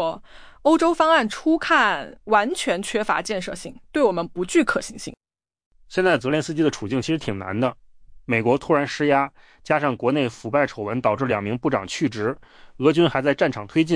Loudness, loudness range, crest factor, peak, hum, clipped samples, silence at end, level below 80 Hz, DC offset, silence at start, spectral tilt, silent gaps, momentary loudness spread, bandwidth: -22 LUFS; 4 LU; 18 dB; -4 dBFS; none; under 0.1%; 0 s; -52 dBFS; under 0.1%; 0 s; -5 dB/octave; 5.66-5.71 s; 10 LU; 10.5 kHz